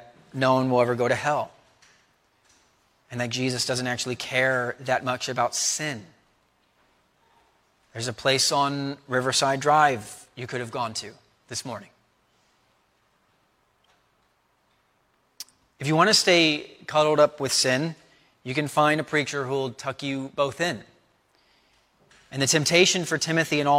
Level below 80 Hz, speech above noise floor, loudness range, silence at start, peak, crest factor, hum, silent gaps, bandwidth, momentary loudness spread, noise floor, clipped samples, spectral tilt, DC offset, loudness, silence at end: -68 dBFS; 44 dB; 9 LU; 0 s; -4 dBFS; 22 dB; none; none; 16.5 kHz; 19 LU; -67 dBFS; under 0.1%; -3 dB/octave; under 0.1%; -23 LUFS; 0 s